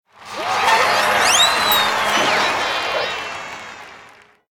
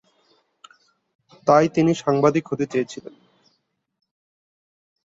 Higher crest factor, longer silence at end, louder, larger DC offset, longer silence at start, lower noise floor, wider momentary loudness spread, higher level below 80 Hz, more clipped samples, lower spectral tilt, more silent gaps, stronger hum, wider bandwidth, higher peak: about the same, 18 dB vs 22 dB; second, 0.45 s vs 1.95 s; first, -16 LUFS vs -20 LUFS; neither; second, 0.2 s vs 1.45 s; second, -46 dBFS vs -71 dBFS; first, 19 LU vs 11 LU; first, -54 dBFS vs -64 dBFS; neither; second, -0.5 dB/octave vs -6.5 dB/octave; neither; neither; first, 18 kHz vs 7.8 kHz; about the same, -2 dBFS vs -2 dBFS